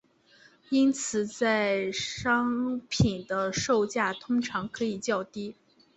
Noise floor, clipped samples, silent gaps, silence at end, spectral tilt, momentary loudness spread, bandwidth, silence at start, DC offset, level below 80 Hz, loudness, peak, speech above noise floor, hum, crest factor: -59 dBFS; under 0.1%; none; 0.45 s; -4.5 dB/octave; 7 LU; 8.2 kHz; 0.7 s; under 0.1%; -54 dBFS; -28 LUFS; -10 dBFS; 32 dB; none; 18 dB